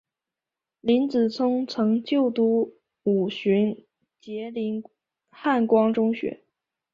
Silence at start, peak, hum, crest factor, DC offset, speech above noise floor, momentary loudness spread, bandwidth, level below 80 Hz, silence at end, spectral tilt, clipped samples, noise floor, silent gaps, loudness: 0.85 s; -8 dBFS; none; 16 dB; under 0.1%; 66 dB; 12 LU; 7 kHz; -68 dBFS; 0.6 s; -7.5 dB/octave; under 0.1%; -89 dBFS; none; -24 LUFS